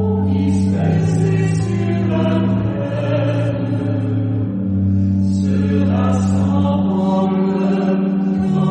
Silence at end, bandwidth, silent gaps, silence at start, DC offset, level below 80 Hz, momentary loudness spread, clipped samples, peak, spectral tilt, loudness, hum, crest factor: 0 s; 9 kHz; none; 0 s; under 0.1%; -44 dBFS; 3 LU; under 0.1%; -4 dBFS; -8.5 dB/octave; -17 LUFS; none; 12 dB